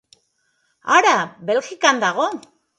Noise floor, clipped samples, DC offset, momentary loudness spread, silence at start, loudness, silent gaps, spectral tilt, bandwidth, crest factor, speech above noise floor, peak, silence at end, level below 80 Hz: -67 dBFS; under 0.1%; under 0.1%; 12 LU; 0.85 s; -18 LUFS; none; -2 dB/octave; 11 kHz; 20 dB; 49 dB; 0 dBFS; 0.4 s; -72 dBFS